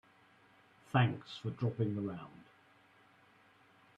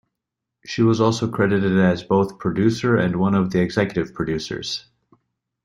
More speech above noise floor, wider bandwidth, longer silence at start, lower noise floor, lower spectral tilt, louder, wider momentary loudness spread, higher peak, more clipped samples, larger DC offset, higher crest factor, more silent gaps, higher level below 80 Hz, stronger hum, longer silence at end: second, 31 dB vs 63 dB; second, 7.6 kHz vs 10.5 kHz; first, 0.95 s vs 0.65 s; second, -66 dBFS vs -83 dBFS; first, -8 dB/octave vs -6.5 dB/octave; second, -36 LUFS vs -20 LUFS; first, 14 LU vs 9 LU; second, -16 dBFS vs -4 dBFS; neither; neither; first, 24 dB vs 18 dB; neither; second, -74 dBFS vs -52 dBFS; neither; first, 1.55 s vs 0.85 s